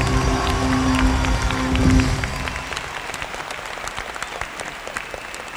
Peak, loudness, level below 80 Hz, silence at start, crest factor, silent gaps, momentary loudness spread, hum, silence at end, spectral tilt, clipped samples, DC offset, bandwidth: -2 dBFS; -22 LUFS; -28 dBFS; 0 s; 18 dB; none; 11 LU; none; 0 s; -5 dB/octave; under 0.1%; under 0.1%; over 20 kHz